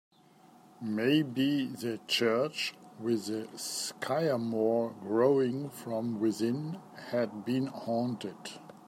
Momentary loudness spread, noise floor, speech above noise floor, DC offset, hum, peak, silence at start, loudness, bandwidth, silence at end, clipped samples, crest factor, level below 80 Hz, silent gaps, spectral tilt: 10 LU; -59 dBFS; 28 dB; under 0.1%; none; -14 dBFS; 0.8 s; -32 LUFS; 16 kHz; 0 s; under 0.1%; 18 dB; -80 dBFS; none; -5 dB/octave